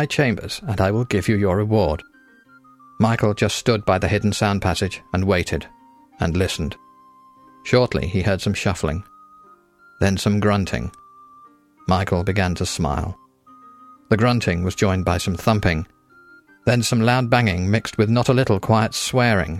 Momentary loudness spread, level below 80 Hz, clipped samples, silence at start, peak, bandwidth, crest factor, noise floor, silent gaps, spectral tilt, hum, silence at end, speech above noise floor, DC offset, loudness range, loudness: 9 LU; -40 dBFS; under 0.1%; 0 s; -4 dBFS; 15 kHz; 16 dB; -51 dBFS; none; -5.5 dB/octave; none; 0 s; 32 dB; under 0.1%; 4 LU; -20 LUFS